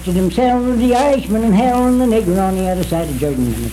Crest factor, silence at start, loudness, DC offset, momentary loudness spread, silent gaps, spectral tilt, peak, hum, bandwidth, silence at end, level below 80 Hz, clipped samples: 12 dB; 0 s; -15 LUFS; under 0.1%; 5 LU; none; -6.5 dB/octave; -2 dBFS; none; 16 kHz; 0 s; -30 dBFS; under 0.1%